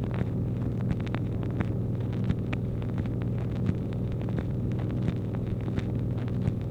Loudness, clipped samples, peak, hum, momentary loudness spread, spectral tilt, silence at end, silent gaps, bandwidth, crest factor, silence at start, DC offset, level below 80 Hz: -30 LUFS; under 0.1%; -12 dBFS; none; 2 LU; -9.5 dB/octave; 0 s; none; 6.2 kHz; 18 dB; 0 s; under 0.1%; -42 dBFS